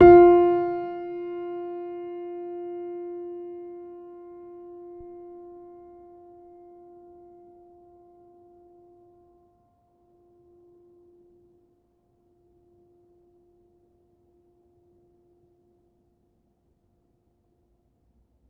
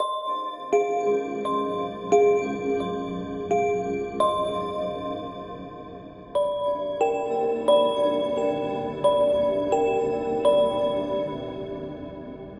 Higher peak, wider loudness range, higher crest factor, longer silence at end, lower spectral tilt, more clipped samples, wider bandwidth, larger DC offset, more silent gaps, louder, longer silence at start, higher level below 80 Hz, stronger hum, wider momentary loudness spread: first, -2 dBFS vs -8 dBFS; first, 25 LU vs 5 LU; first, 26 dB vs 16 dB; first, 13 s vs 0 s; first, -7.5 dB/octave vs -5.5 dB/octave; neither; second, 3.8 kHz vs 10.5 kHz; neither; neither; about the same, -23 LUFS vs -25 LUFS; about the same, 0 s vs 0 s; about the same, -54 dBFS vs -54 dBFS; neither; first, 29 LU vs 14 LU